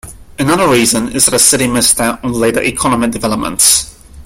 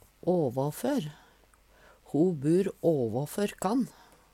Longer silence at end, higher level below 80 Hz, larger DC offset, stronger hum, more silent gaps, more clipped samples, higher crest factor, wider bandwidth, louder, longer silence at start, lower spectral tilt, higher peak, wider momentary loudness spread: second, 0 s vs 0.45 s; first, -36 dBFS vs -64 dBFS; neither; neither; neither; first, 0.1% vs under 0.1%; about the same, 12 dB vs 16 dB; first, over 20 kHz vs 17 kHz; first, -10 LUFS vs -29 LUFS; second, 0.05 s vs 0.25 s; second, -2.5 dB/octave vs -7 dB/octave; first, 0 dBFS vs -14 dBFS; about the same, 8 LU vs 7 LU